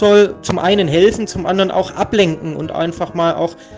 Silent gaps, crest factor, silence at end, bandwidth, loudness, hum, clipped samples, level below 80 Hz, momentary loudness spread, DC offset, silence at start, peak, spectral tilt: none; 14 dB; 0 s; 9.6 kHz; -16 LUFS; none; under 0.1%; -42 dBFS; 9 LU; under 0.1%; 0 s; 0 dBFS; -5.5 dB/octave